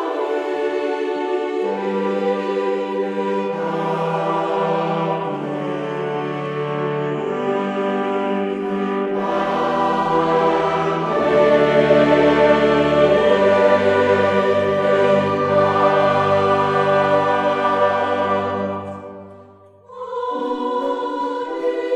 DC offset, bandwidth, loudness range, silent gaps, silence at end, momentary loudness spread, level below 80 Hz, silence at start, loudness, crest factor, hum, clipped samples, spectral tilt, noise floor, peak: under 0.1%; 9.4 kHz; 8 LU; none; 0 s; 10 LU; -52 dBFS; 0 s; -18 LUFS; 16 dB; none; under 0.1%; -6.5 dB/octave; -45 dBFS; -2 dBFS